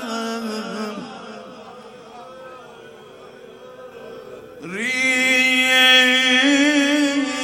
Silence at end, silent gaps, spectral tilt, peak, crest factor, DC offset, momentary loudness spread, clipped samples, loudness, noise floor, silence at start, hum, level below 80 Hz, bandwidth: 0 s; none; -1.5 dB/octave; -2 dBFS; 18 dB; under 0.1%; 26 LU; under 0.1%; -15 LUFS; -41 dBFS; 0 s; none; -66 dBFS; 16.5 kHz